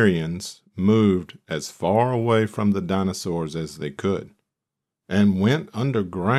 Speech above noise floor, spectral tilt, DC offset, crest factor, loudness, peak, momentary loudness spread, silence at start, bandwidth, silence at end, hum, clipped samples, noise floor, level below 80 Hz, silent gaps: 64 dB; -6.5 dB/octave; under 0.1%; 18 dB; -23 LUFS; -6 dBFS; 11 LU; 0 s; 13 kHz; 0 s; none; under 0.1%; -85 dBFS; -56 dBFS; none